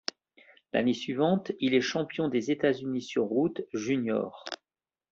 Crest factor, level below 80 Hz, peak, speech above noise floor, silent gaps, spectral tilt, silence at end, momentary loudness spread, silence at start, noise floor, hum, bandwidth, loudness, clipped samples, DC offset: 20 dB; -70 dBFS; -10 dBFS; over 62 dB; none; -4.5 dB/octave; 0.55 s; 9 LU; 0.75 s; under -90 dBFS; none; 7.6 kHz; -29 LUFS; under 0.1%; under 0.1%